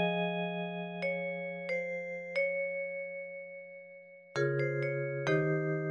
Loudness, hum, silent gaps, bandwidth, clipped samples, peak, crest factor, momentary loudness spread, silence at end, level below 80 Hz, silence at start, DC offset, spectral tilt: -34 LUFS; none; none; 9 kHz; under 0.1%; -18 dBFS; 18 dB; 14 LU; 0 s; -76 dBFS; 0 s; under 0.1%; -7 dB/octave